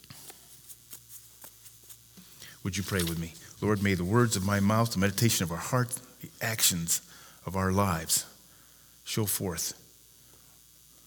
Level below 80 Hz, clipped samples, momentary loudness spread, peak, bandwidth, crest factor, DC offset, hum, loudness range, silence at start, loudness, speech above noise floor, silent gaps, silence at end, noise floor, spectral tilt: -58 dBFS; under 0.1%; 22 LU; -10 dBFS; over 20 kHz; 20 dB; under 0.1%; none; 8 LU; 0.1 s; -28 LUFS; 28 dB; none; 1.35 s; -57 dBFS; -4 dB/octave